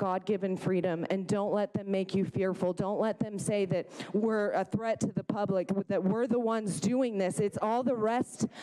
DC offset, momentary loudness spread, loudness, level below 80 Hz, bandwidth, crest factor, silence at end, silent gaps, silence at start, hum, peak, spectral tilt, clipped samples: under 0.1%; 3 LU; -31 LUFS; -68 dBFS; 12.5 kHz; 14 dB; 0 s; none; 0 s; none; -16 dBFS; -6.5 dB/octave; under 0.1%